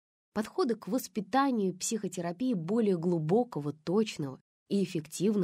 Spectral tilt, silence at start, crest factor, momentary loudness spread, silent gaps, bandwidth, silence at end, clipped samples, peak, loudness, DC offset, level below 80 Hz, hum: -5.5 dB/octave; 0.35 s; 16 dB; 8 LU; 4.41-4.66 s; 16 kHz; 0 s; under 0.1%; -16 dBFS; -32 LUFS; under 0.1%; -74 dBFS; none